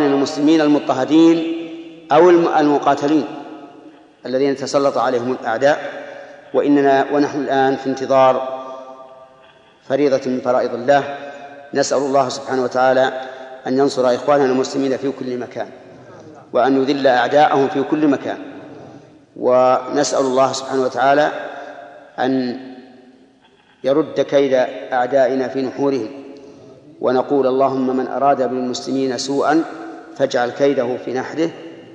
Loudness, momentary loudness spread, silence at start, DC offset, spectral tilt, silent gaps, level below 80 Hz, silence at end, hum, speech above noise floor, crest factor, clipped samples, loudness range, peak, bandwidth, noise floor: -17 LUFS; 18 LU; 0 s; under 0.1%; -5 dB/octave; none; -72 dBFS; 0 s; none; 36 dB; 16 dB; under 0.1%; 3 LU; 0 dBFS; 10 kHz; -52 dBFS